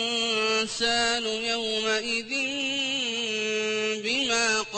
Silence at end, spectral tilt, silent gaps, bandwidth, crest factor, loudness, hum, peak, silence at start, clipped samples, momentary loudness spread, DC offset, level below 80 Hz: 0 s; -1 dB/octave; none; 8.8 kHz; 14 dB; -25 LUFS; none; -12 dBFS; 0 s; under 0.1%; 4 LU; under 0.1%; -60 dBFS